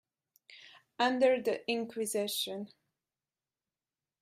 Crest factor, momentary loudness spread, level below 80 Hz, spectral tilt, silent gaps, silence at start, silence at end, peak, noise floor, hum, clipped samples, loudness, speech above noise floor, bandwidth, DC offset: 20 dB; 24 LU; -84 dBFS; -3 dB/octave; none; 0.5 s; 1.55 s; -16 dBFS; under -90 dBFS; none; under 0.1%; -32 LUFS; over 58 dB; 15.5 kHz; under 0.1%